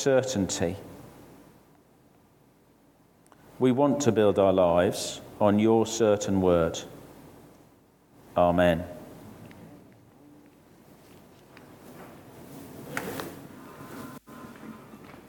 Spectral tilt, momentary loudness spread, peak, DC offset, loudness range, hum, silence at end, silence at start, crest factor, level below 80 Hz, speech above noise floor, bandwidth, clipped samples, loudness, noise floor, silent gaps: -5.5 dB/octave; 25 LU; -10 dBFS; under 0.1%; 17 LU; none; 0.2 s; 0 s; 20 dB; -58 dBFS; 37 dB; 19 kHz; under 0.1%; -25 LUFS; -60 dBFS; none